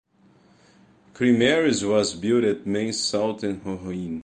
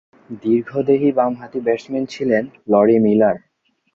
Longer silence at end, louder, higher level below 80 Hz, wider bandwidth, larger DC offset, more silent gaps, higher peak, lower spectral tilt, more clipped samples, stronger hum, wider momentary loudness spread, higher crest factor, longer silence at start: second, 0 s vs 0.6 s; second, -23 LUFS vs -18 LUFS; about the same, -56 dBFS vs -60 dBFS; first, 10 kHz vs 7.4 kHz; neither; neither; second, -8 dBFS vs -2 dBFS; second, -4.5 dB/octave vs -8 dB/octave; neither; neither; about the same, 12 LU vs 11 LU; about the same, 16 dB vs 16 dB; first, 1.15 s vs 0.3 s